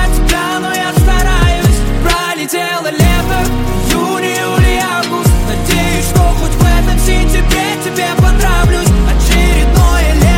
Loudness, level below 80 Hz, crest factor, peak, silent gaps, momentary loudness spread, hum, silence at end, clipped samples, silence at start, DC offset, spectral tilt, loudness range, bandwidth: -12 LUFS; -12 dBFS; 10 dB; 0 dBFS; none; 4 LU; none; 0 s; under 0.1%; 0 s; under 0.1%; -5 dB/octave; 2 LU; 17 kHz